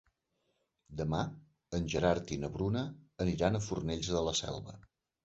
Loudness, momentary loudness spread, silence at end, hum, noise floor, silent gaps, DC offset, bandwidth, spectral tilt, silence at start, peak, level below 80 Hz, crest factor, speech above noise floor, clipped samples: -35 LUFS; 11 LU; 0.45 s; none; -80 dBFS; none; under 0.1%; 8 kHz; -5.5 dB/octave; 0.9 s; -14 dBFS; -52 dBFS; 22 dB; 46 dB; under 0.1%